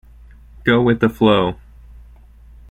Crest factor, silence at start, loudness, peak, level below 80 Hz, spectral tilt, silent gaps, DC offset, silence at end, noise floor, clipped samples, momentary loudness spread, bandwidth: 18 dB; 0.65 s; -16 LUFS; -2 dBFS; -42 dBFS; -8 dB/octave; none; under 0.1%; 1.15 s; -43 dBFS; under 0.1%; 9 LU; 13.5 kHz